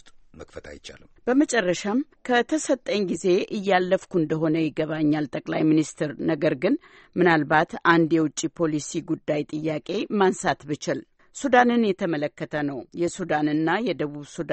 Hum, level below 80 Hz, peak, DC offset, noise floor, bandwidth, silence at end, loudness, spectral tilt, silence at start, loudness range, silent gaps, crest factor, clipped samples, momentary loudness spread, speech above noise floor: none; -60 dBFS; -4 dBFS; under 0.1%; -46 dBFS; 8.8 kHz; 0 s; -24 LUFS; -5 dB/octave; 0.05 s; 2 LU; none; 20 dB; under 0.1%; 11 LU; 22 dB